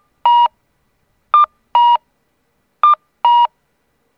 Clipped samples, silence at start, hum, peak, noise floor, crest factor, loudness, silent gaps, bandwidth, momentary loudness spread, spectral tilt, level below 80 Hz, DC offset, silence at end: under 0.1%; 0.25 s; none; 0 dBFS; -64 dBFS; 16 dB; -14 LUFS; none; 5 kHz; 4 LU; -1 dB/octave; -68 dBFS; under 0.1%; 0.7 s